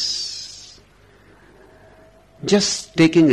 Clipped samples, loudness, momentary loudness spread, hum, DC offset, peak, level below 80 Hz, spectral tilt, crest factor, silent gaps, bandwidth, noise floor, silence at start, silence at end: under 0.1%; -19 LUFS; 22 LU; 50 Hz at -60 dBFS; under 0.1%; -4 dBFS; -56 dBFS; -4.5 dB/octave; 16 dB; none; 12 kHz; -51 dBFS; 0 s; 0 s